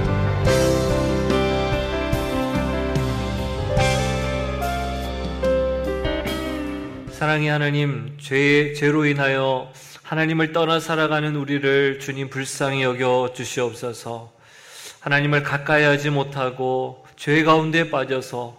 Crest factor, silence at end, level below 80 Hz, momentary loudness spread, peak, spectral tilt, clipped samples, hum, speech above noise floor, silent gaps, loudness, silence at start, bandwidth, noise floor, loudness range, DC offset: 18 dB; 0.05 s; -34 dBFS; 11 LU; -4 dBFS; -5.5 dB/octave; under 0.1%; none; 23 dB; none; -21 LUFS; 0 s; 15.5 kHz; -44 dBFS; 3 LU; under 0.1%